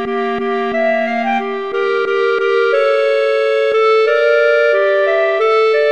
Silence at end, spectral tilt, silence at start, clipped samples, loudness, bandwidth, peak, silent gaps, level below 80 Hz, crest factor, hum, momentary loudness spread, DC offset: 0 s; -4 dB/octave; 0 s; under 0.1%; -14 LUFS; 8.6 kHz; -2 dBFS; none; -60 dBFS; 12 dB; none; 6 LU; 0.5%